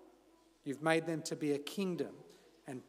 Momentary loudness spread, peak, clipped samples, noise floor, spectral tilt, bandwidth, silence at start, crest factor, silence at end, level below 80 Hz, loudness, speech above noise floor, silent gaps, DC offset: 16 LU; -18 dBFS; under 0.1%; -67 dBFS; -5 dB/octave; 16 kHz; 0 s; 22 dB; 0.05 s; -84 dBFS; -37 LUFS; 31 dB; none; under 0.1%